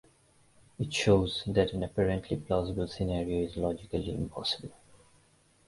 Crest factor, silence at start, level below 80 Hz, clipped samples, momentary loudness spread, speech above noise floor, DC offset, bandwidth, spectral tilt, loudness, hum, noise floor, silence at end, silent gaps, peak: 22 dB; 0.8 s; -48 dBFS; under 0.1%; 9 LU; 35 dB; under 0.1%; 11.5 kHz; -6 dB/octave; -31 LUFS; none; -65 dBFS; 0.95 s; none; -10 dBFS